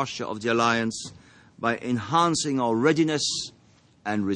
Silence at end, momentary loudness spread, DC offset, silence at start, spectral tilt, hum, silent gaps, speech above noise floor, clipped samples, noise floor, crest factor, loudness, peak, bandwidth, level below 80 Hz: 0 s; 12 LU; under 0.1%; 0 s; -4 dB/octave; none; none; 28 dB; under 0.1%; -53 dBFS; 18 dB; -24 LUFS; -6 dBFS; 10.5 kHz; -64 dBFS